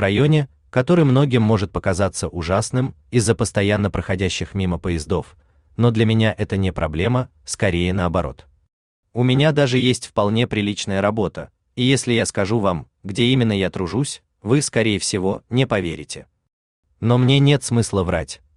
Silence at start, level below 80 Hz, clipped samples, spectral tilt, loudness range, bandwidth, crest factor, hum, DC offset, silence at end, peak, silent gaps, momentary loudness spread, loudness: 0 s; -44 dBFS; under 0.1%; -5.5 dB/octave; 2 LU; 11 kHz; 16 dB; none; under 0.1%; 0.2 s; -4 dBFS; 8.73-9.03 s, 16.53-16.83 s; 9 LU; -19 LUFS